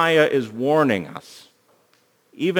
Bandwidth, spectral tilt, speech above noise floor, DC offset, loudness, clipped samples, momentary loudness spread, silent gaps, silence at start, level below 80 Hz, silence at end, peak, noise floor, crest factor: over 20 kHz; -5.5 dB/octave; 42 dB; under 0.1%; -20 LUFS; under 0.1%; 16 LU; none; 0 s; -70 dBFS; 0 s; -4 dBFS; -61 dBFS; 18 dB